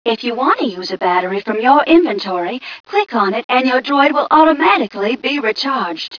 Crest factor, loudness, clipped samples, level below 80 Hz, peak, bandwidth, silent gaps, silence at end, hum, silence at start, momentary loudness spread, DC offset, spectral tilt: 14 dB; -14 LUFS; under 0.1%; -58 dBFS; 0 dBFS; 5.4 kHz; 2.80-2.84 s, 3.44-3.49 s; 0 s; none; 0.05 s; 9 LU; under 0.1%; -5 dB/octave